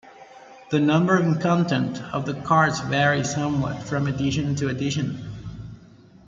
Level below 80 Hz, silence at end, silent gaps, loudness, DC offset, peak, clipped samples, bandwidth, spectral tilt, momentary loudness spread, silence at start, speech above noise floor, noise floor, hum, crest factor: -52 dBFS; 0.5 s; none; -23 LUFS; under 0.1%; -4 dBFS; under 0.1%; 7.8 kHz; -6 dB/octave; 14 LU; 0.05 s; 27 dB; -49 dBFS; none; 18 dB